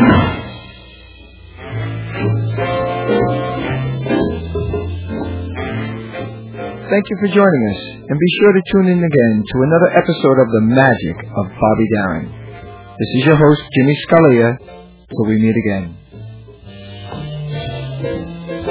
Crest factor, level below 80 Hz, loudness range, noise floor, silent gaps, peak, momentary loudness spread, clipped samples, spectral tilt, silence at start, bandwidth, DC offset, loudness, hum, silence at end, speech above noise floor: 16 dB; -36 dBFS; 8 LU; -39 dBFS; none; 0 dBFS; 18 LU; under 0.1%; -11.5 dB/octave; 0 s; 4 kHz; under 0.1%; -15 LUFS; none; 0 s; 26 dB